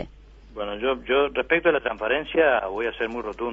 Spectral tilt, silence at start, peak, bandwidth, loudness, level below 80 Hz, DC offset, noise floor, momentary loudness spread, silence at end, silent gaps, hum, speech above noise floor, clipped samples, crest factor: -6 dB/octave; 0 s; -6 dBFS; 5.8 kHz; -23 LUFS; -48 dBFS; under 0.1%; -47 dBFS; 12 LU; 0 s; none; none; 23 dB; under 0.1%; 18 dB